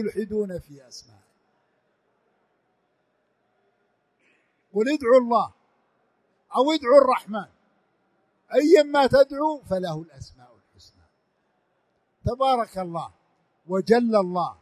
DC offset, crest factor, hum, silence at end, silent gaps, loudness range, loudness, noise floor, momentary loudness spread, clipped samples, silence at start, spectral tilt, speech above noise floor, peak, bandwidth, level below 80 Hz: under 0.1%; 22 dB; none; 0.1 s; none; 11 LU; -22 LUFS; -71 dBFS; 19 LU; under 0.1%; 0 s; -6 dB/octave; 49 dB; -4 dBFS; 13 kHz; -54 dBFS